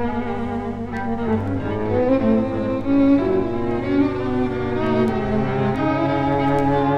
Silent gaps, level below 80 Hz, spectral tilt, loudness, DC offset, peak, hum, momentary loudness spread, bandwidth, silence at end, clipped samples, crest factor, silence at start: none; -38 dBFS; -9 dB/octave; -20 LUFS; under 0.1%; -6 dBFS; 50 Hz at -35 dBFS; 7 LU; 7.4 kHz; 0 s; under 0.1%; 14 dB; 0 s